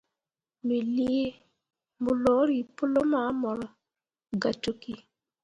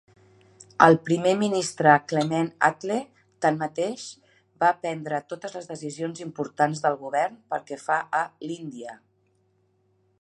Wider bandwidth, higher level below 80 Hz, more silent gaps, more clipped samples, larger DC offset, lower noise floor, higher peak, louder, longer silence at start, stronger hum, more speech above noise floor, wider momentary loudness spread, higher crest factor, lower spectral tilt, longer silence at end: about the same, 10.5 kHz vs 11.5 kHz; first, -62 dBFS vs -72 dBFS; neither; neither; neither; first, under -90 dBFS vs -67 dBFS; second, -12 dBFS vs 0 dBFS; second, -28 LUFS vs -25 LUFS; second, 0.65 s vs 0.8 s; neither; first, over 63 dB vs 43 dB; second, 13 LU vs 17 LU; second, 18 dB vs 24 dB; first, -6.5 dB/octave vs -5 dB/octave; second, 0.45 s vs 1.25 s